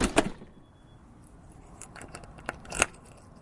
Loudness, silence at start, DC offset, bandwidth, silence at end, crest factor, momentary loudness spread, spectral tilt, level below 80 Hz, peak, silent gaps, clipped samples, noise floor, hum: -32 LUFS; 0 s; under 0.1%; 11.5 kHz; 0.1 s; 32 dB; 25 LU; -3 dB/octave; -46 dBFS; -2 dBFS; none; under 0.1%; -54 dBFS; none